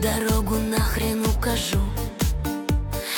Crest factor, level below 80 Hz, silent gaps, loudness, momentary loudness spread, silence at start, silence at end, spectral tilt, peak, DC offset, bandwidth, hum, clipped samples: 14 dB; -28 dBFS; none; -24 LUFS; 3 LU; 0 s; 0 s; -5 dB/octave; -10 dBFS; under 0.1%; over 20 kHz; none; under 0.1%